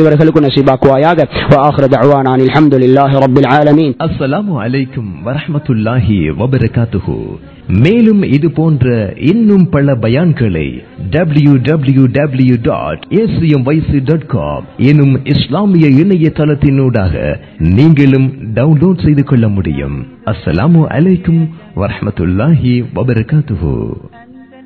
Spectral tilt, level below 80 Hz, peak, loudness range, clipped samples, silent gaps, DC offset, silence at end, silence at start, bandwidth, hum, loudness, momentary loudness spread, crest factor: -10 dB/octave; -30 dBFS; 0 dBFS; 4 LU; 2%; none; 0.2%; 0.2 s; 0 s; 5.4 kHz; none; -10 LUFS; 10 LU; 10 dB